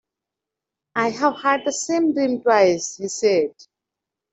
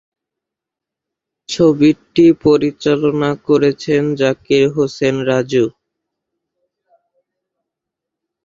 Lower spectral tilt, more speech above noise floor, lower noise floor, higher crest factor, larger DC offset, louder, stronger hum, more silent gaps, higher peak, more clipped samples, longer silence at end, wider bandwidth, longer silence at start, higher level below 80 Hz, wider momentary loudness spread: second, -3.5 dB/octave vs -6.5 dB/octave; second, 66 dB vs 71 dB; about the same, -86 dBFS vs -84 dBFS; about the same, 18 dB vs 16 dB; neither; second, -20 LUFS vs -14 LUFS; neither; neither; second, -4 dBFS vs 0 dBFS; neither; second, 0.85 s vs 2.75 s; about the same, 8.2 kHz vs 7.8 kHz; second, 0.95 s vs 1.5 s; second, -68 dBFS vs -54 dBFS; first, 9 LU vs 6 LU